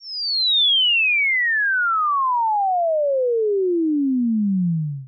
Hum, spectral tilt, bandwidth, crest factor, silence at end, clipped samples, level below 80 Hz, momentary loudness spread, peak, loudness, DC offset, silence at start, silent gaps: none; -1.5 dB/octave; 5.4 kHz; 6 dB; 0 s; under 0.1%; under -90 dBFS; 6 LU; -14 dBFS; -18 LUFS; under 0.1%; 0 s; none